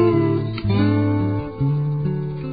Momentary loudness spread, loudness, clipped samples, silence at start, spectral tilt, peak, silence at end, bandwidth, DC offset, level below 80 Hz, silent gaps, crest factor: 6 LU; -21 LUFS; under 0.1%; 0 s; -13 dB/octave; -6 dBFS; 0 s; 5 kHz; 0.5%; -40 dBFS; none; 14 dB